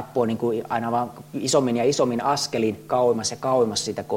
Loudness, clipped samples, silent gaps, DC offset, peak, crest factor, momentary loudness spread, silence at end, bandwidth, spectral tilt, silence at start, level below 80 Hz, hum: -23 LUFS; under 0.1%; none; under 0.1%; -8 dBFS; 16 dB; 5 LU; 0 s; 16.5 kHz; -4.5 dB/octave; 0 s; -62 dBFS; none